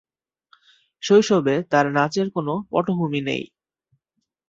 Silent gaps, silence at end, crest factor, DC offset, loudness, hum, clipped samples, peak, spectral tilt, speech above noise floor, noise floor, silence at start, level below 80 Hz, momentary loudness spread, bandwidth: none; 1.05 s; 20 dB; under 0.1%; -21 LUFS; none; under 0.1%; -2 dBFS; -5.5 dB/octave; 57 dB; -78 dBFS; 1 s; -64 dBFS; 11 LU; 7.8 kHz